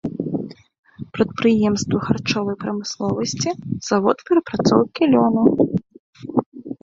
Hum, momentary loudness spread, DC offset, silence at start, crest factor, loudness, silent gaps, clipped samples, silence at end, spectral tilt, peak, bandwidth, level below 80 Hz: none; 11 LU; under 0.1%; 0.05 s; 18 dB; -20 LUFS; 0.79-0.83 s, 5.99-6.13 s, 6.46-6.52 s; under 0.1%; 0.1 s; -5.5 dB/octave; -2 dBFS; 7.8 kHz; -52 dBFS